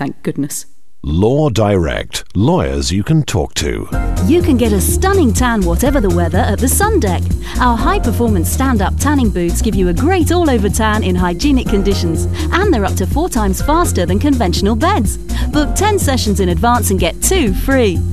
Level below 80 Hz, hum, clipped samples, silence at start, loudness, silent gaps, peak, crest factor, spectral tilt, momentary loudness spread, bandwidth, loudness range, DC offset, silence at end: -20 dBFS; none; under 0.1%; 0 s; -14 LUFS; none; 0 dBFS; 12 dB; -5.5 dB/octave; 6 LU; 13.5 kHz; 2 LU; 3%; 0 s